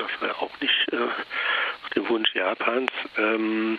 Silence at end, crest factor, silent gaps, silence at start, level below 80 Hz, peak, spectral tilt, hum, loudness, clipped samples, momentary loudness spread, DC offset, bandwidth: 0 s; 22 dB; none; 0 s; -72 dBFS; -4 dBFS; -5 dB/octave; none; -25 LUFS; under 0.1%; 6 LU; under 0.1%; 6.4 kHz